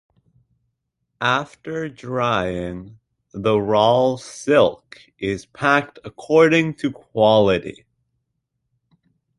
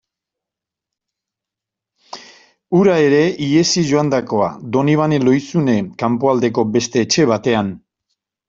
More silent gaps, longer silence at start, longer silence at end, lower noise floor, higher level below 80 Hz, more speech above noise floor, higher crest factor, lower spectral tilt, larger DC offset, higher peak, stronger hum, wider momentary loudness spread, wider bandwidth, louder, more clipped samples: neither; second, 1.2 s vs 2.15 s; first, 1.65 s vs 0.7 s; second, -76 dBFS vs -85 dBFS; about the same, -52 dBFS vs -54 dBFS; second, 56 dB vs 70 dB; about the same, 18 dB vs 16 dB; about the same, -5.5 dB/octave vs -5.5 dB/octave; neither; about the same, -2 dBFS vs -2 dBFS; neither; first, 14 LU vs 6 LU; first, 11.5 kHz vs 7.8 kHz; second, -19 LUFS vs -16 LUFS; neither